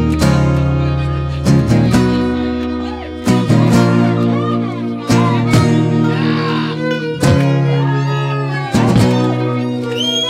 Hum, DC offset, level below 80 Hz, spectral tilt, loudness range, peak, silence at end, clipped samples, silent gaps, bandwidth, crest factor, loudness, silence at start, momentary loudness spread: none; under 0.1%; -32 dBFS; -6.5 dB/octave; 1 LU; 0 dBFS; 0 s; under 0.1%; none; 14.5 kHz; 12 dB; -14 LUFS; 0 s; 7 LU